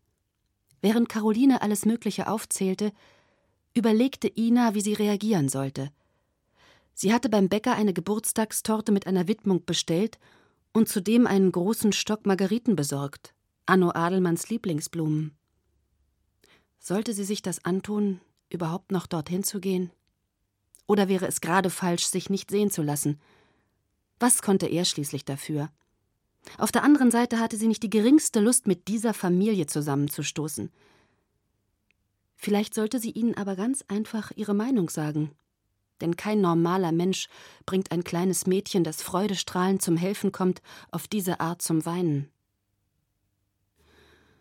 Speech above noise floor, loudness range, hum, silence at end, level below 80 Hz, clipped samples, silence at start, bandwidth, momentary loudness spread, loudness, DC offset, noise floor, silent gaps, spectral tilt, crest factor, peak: 52 dB; 7 LU; none; 2.15 s; -68 dBFS; under 0.1%; 0.85 s; 17.5 kHz; 10 LU; -26 LUFS; under 0.1%; -77 dBFS; none; -5 dB/octave; 20 dB; -6 dBFS